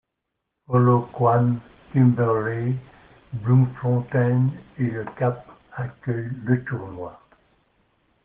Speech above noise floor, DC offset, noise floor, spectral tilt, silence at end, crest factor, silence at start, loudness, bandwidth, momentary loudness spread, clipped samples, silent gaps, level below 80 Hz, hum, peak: 59 dB; under 0.1%; -80 dBFS; -10 dB/octave; 1.1 s; 16 dB; 0.7 s; -23 LUFS; 3.4 kHz; 15 LU; under 0.1%; none; -58 dBFS; none; -6 dBFS